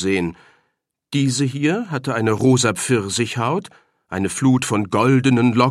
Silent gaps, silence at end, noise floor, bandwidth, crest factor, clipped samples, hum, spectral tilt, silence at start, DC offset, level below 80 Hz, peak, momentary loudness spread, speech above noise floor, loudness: none; 0 s; -72 dBFS; 14 kHz; 18 dB; under 0.1%; none; -5.5 dB/octave; 0 s; under 0.1%; -56 dBFS; -2 dBFS; 9 LU; 54 dB; -19 LUFS